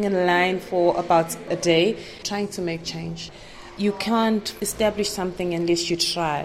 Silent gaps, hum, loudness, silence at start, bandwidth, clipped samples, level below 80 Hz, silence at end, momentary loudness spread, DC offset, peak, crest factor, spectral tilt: none; none; -23 LUFS; 0 s; 16 kHz; under 0.1%; -50 dBFS; 0 s; 11 LU; under 0.1%; -6 dBFS; 18 dB; -4 dB/octave